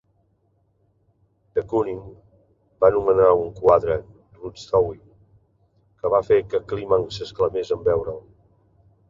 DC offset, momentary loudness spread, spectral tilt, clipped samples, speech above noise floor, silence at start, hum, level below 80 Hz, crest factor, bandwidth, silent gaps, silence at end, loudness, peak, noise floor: under 0.1%; 17 LU; -7 dB/octave; under 0.1%; 45 dB; 1.55 s; none; -50 dBFS; 20 dB; 7.4 kHz; none; 0.9 s; -21 LUFS; -2 dBFS; -65 dBFS